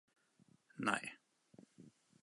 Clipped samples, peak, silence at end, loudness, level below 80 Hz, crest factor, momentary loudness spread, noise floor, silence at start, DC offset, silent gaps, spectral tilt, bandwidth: under 0.1%; -18 dBFS; 0.35 s; -41 LUFS; -90 dBFS; 30 dB; 25 LU; -72 dBFS; 0.75 s; under 0.1%; none; -3.5 dB/octave; 11.5 kHz